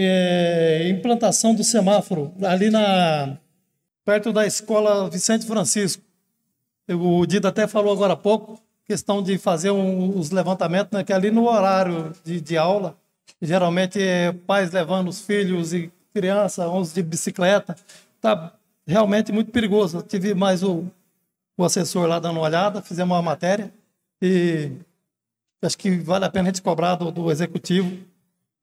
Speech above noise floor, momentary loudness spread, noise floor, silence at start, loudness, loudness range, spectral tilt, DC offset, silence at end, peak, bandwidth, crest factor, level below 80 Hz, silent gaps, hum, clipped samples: 62 dB; 10 LU; -83 dBFS; 0 s; -21 LUFS; 3 LU; -5 dB/octave; under 0.1%; 0.6 s; -6 dBFS; 15 kHz; 14 dB; -66 dBFS; none; none; under 0.1%